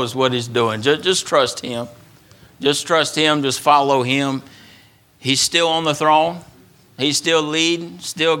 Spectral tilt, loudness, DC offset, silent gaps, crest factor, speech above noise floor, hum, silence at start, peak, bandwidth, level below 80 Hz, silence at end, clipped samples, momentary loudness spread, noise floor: -3 dB/octave; -17 LUFS; under 0.1%; none; 18 dB; 32 dB; none; 0 s; 0 dBFS; 18 kHz; -62 dBFS; 0 s; under 0.1%; 11 LU; -50 dBFS